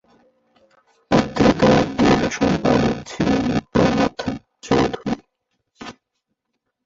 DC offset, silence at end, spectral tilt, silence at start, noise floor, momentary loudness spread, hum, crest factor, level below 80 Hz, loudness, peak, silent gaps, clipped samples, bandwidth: under 0.1%; 0.95 s; -6 dB/octave; 1.1 s; -76 dBFS; 15 LU; none; 18 dB; -40 dBFS; -19 LUFS; -2 dBFS; none; under 0.1%; 7.8 kHz